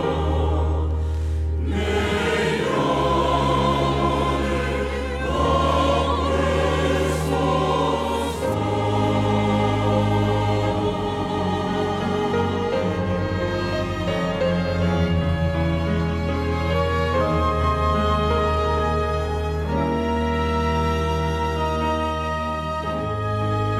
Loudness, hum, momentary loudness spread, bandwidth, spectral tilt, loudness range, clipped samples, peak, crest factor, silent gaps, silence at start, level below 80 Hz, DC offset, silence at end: -22 LUFS; none; 5 LU; 13 kHz; -6.5 dB/octave; 2 LU; under 0.1%; -6 dBFS; 14 dB; none; 0 s; -32 dBFS; under 0.1%; 0 s